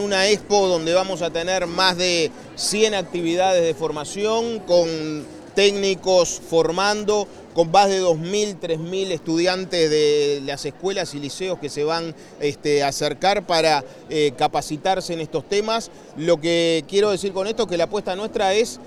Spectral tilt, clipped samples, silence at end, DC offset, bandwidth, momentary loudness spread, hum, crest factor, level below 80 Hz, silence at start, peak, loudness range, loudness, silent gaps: -3.5 dB/octave; under 0.1%; 0 s; under 0.1%; 13.5 kHz; 9 LU; none; 18 dB; -52 dBFS; 0 s; -2 dBFS; 2 LU; -21 LUFS; none